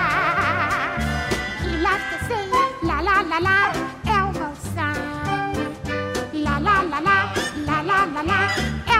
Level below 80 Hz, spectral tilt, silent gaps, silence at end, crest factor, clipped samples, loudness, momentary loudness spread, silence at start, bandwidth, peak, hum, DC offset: -36 dBFS; -4.5 dB/octave; none; 0 s; 18 dB; under 0.1%; -21 LUFS; 7 LU; 0 s; 16 kHz; -4 dBFS; none; under 0.1%